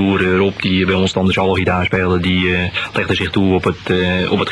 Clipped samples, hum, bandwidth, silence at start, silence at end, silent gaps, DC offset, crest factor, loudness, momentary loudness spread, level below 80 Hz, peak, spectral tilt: under 0.1%; none; 11 kHz; 0 s; 0 s; none; under 0.1%; 14 dB; -15 LUFS; 3 LU; -40 dBFS; -2 dBFS; -6.5 dB/octave